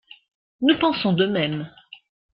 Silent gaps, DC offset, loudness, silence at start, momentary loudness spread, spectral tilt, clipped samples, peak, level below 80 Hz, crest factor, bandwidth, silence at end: none; under 0.1%; -21 LUFS; 0.6 s; 11 LU; -10 dB/octave; under 0.1%; -6 dBFS; -60 dBFS; 18 dB; 5.4 kHz; 0.65 s